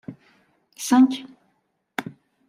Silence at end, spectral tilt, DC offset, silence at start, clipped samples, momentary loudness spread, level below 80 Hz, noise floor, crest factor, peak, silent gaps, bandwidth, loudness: 0.4 s; -3.5 dB/octave; under 0.1%; 0.1 s; under 0.1%; 23 LU; -74 dBFS; -71 dBFS; 18 dB; -6 dBFS; none; 15.5 kHz; -22 LUFS